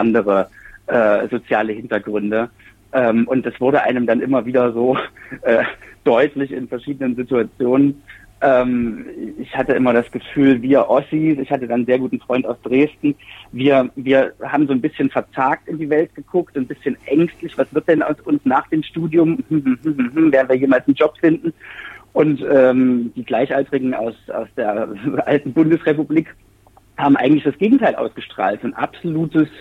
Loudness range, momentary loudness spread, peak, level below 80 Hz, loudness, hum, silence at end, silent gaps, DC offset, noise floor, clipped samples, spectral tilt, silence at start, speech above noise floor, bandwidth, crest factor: 3 LU; 10 LU; -2 dBFS; -54 dBFS; -18 LUFS; none; 0 s; none; under 0.1%; -51 dBFS; under 0.1%; -8.5 dB/octave; 0 s; 33 dB; 4.3 kHz; 14 dB